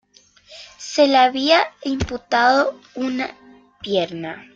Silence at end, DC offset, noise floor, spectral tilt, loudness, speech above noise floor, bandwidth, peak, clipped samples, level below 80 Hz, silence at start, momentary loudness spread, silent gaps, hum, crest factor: 0.1 s; under 0.1%; -52 dBFS; -4 dB/octave; -19 LUFS; 33 dB; 7.8 kHz; -2 dBFS; under 0.1%; -46 dBFS; 0.5 s; 16 LU; none; none; 18 dB